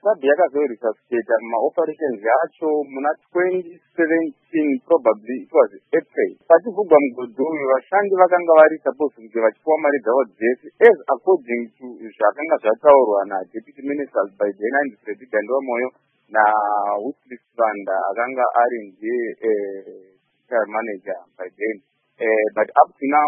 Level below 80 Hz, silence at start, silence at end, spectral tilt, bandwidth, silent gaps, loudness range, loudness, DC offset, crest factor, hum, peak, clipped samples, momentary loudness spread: -72 dBFS; 0.05 s; 0 s; -9 dB/octave; 3.8 kHz; none; 6 LU; -19 LUFS; under 0.1%; 20 dB; none; 0 dBFS; under 0.1%; 13 LU